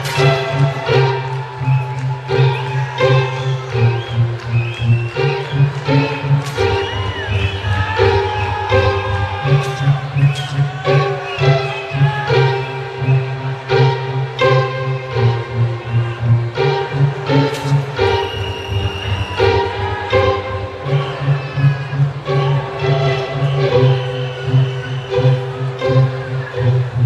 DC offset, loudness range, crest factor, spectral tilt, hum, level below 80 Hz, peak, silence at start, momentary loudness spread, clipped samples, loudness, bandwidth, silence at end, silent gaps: under 0.1%; 1 LU; 14 dB; -7 dB/octave; none; -38 dBFS; -2 dBFS; 0 s; 6 LU; under 0.1%; -17 LUFS; 9.2 kHz; 0 s; none